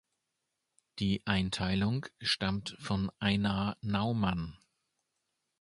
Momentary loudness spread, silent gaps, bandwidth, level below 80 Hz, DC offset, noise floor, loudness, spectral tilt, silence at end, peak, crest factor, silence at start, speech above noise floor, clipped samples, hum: 6 LU; none; 11.5 kHz; -52 dBFS; under 0.1%; -85 dBFS; -33 LUFS; -5.5 dB/octave; 1.05 s; -12 dBFS; 22 dB; 0.95 s; 52 dB; under 0.1%; none